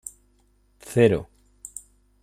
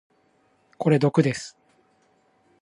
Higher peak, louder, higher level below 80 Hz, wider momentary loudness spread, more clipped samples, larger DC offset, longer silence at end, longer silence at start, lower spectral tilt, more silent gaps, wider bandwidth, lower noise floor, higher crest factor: about the same, -6 dBFS vs -6 dBFS; about the same, -22 LUFS vs -23 LUFS; first, -54 dBFS vs -66 dBFS; first, 22 LU vs 15 LU; neither; neither; second, 1 s vs 1.15 s; about the same, 0.85 s vs 0.8 s; about the same, -6 dB/octave vs -7 dB/octave; neither; first, 15 kHz vs 11.5 kHz; about the same, -62 dBFS vs -64 dBFS; about the same, 22 dB vs 20 dB